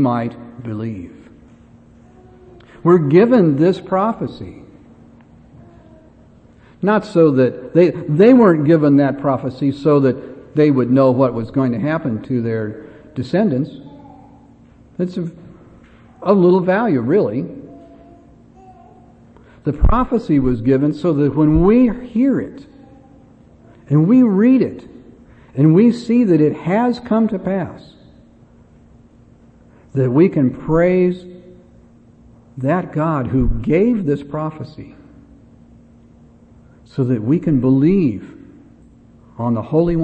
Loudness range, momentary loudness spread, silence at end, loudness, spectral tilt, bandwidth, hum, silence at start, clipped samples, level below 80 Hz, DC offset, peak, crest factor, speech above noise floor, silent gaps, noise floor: 9 LU; 16 LU; 0 s; -16 LUFS; -9.5 dB/octave; 8.4 kHz; none; 0 s; under 0.1%; -34 dBFS; under 0.1%; 0 dBFS; 16 dB; 32 dB; none; -47 dBFS